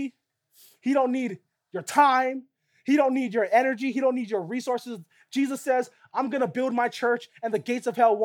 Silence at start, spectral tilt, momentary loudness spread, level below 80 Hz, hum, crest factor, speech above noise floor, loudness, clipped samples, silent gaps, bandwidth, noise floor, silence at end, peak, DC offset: 0 s; -5 dB/octave; 13 LU; -86 dBFS; none; 18 dB; 40 dB; -25 LUFS; under 0.1%; none; 17.5 kHz; -65 dBFS; 0 s; -8 dBFS; under 0.1%